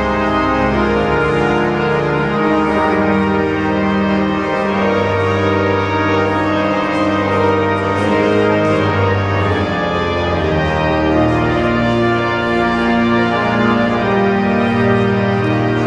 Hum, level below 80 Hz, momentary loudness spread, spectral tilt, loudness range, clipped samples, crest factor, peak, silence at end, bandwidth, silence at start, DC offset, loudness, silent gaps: none; -34 dBFS; 2 LU; -7 dB/octave; 1 LU; under 0.1%; 12 dB; -2 dBFS; 0 s; 10 kHz; 0 s; under 0.1%; -15 LUFS; none